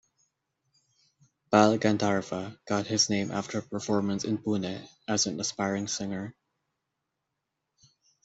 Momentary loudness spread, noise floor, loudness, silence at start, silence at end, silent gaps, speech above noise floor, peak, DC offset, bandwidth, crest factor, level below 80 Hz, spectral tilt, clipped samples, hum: 13 LU; -84 dBFS; -28 LUFS; 1.5 s; 1.95 s; none; 55 dB; -6 dBFS; under 0.1%; 8 kHz; 24 dB; -68 dBFS; -4 dB/octave; under 0.1%; none